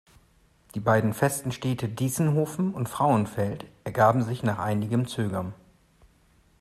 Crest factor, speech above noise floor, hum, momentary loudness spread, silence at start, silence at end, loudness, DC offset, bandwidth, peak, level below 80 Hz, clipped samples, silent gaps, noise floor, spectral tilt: 20 dB; 36 dB; none; 9 LU; 0.75 s; 1.05 s; -26 LUFS; under 0.1%; 15 kHz; -8 dBFS; -58 dBFS; under 0.1%; none; -61 dBFS; -6.5 dB/octave